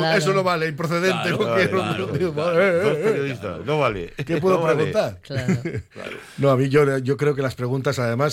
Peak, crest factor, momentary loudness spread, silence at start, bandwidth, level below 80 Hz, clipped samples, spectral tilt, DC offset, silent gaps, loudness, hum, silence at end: -6 dBFS; 16 dB; 9 LU; 0 s; 16 kHz; -52 dBFS; under 0.1%; -6 dB/octave; under 0.1%; none; -21 LUFS; none; 0 s